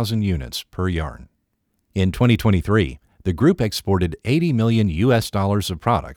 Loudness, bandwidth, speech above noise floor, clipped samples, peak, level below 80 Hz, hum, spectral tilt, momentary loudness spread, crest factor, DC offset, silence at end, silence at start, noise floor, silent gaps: -20 LUFS; 17.5 kHz; 51 dB; under 0.1%; -4 dBFS; -38 dBFS; none; -6.5 dB/octave; 9 LU; 16 dB; under 0.1%; 0 s; 0 s; -71 dBFS; none